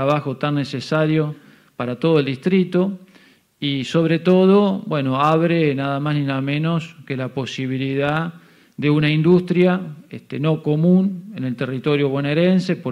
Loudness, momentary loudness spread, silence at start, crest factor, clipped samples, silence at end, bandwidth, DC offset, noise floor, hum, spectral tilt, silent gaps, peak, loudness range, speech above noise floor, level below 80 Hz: -19 LUFS; 11 LU; 0 s; 14 dB; under 0.1%; 0 s; 10.5 kHz; under 0.1%; -52 dBFS; none; -8 dB/octave; none; -4 dBFS; 3 LU; 34 dB; -60 dBFS